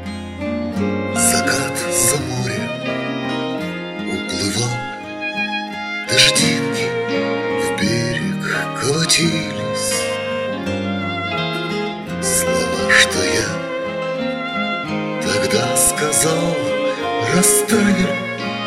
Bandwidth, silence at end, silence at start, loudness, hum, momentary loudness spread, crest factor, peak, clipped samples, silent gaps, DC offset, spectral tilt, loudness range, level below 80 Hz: 16 kHz; 0 s; 0 s; -18 LUFS; none; 11 LU; 18 dB; 0 dBFS; under 0.1%; none; under 0.1%; -3 dB/octave; 4 LU; -48 dBFS